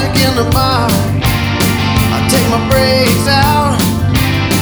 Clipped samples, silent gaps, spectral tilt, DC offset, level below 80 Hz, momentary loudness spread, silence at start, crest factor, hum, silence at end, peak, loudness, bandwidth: under 0.1%; none; -5 dB/octave; under 0.1%; -24 dBFS; 3 LU; 0 s; 12 dB; none; 0 s; 0 dBFS; -11 LUFS; over 20 kHz